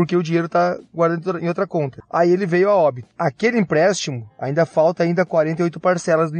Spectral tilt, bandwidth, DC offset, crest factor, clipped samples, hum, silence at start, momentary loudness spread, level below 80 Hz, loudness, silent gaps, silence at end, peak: -6 dB/octave; 9.4 kHz; under 0.1%; 14 dB; under 0.1%; none; 0 s; 7 LU; -64 dBFS; -19 LUFS; none; 0 s; -4 dBFS